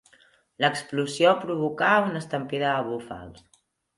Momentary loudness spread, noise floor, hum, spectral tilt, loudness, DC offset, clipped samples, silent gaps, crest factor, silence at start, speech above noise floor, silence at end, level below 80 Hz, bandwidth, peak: 12 LU; -60 dBFS; none; -5 dB/octave; -25 LUFS; under 0.1%; under 0.1%; none; 20 dB; 0.6 s; 35 dB; 0.65 s; -64 dBFS; 11.5 kHz; -6 dBFS